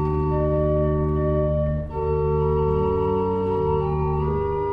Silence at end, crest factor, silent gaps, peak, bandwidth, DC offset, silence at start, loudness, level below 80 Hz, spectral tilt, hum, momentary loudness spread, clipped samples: 0 s; 12 dB; none; -10 dBFS; 4.8 kHz; under 0.1%; 0 s; -22 LUFS; -30 dBFS; -11.5 dB/octave; none; 3 LU; under 0.1%